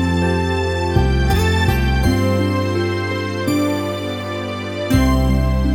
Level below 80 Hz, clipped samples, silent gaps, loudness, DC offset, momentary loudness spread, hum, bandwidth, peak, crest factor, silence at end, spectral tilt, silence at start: -24 dBFS; under 0.1%; none; -18 LUFS; under 0.1%; 8 LU; none; 18 kHz; -2 dBFS; 14 dB; 0 s; -6.5 dB/octave; 0 s